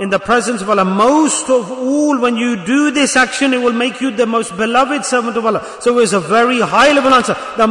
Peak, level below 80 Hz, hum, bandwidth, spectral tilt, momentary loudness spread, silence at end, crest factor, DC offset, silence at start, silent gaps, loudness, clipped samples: -2 dBFS; -48 dBFS; none; 11 kHz; -3.5 dB/octave; 6 LU; 0 s; 12 dB; under 0.1%; 0 s; none; -13 LUFS; under 0.1%